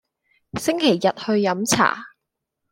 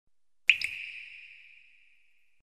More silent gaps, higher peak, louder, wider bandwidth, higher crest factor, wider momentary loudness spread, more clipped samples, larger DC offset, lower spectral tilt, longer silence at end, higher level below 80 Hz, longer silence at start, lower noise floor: neither; first, -2 dBFS vs -6 dBFS; first, -20 LUFS vs -28 LUFS; about the same, 16.5 kHz vs 15 kHz; second, 20 dB vs 30 dB; second, 10 LU vs 23 LU; neither; neither; first, -3.5 dB/octave vs 2.5 dB/octave; second, 0.65 s vs 1.1 s; first, -58 dBFS vs -74 dBFS; about the same, 0.55 s vs 0.5 s; first, -80 dBFS vs -70 dBFS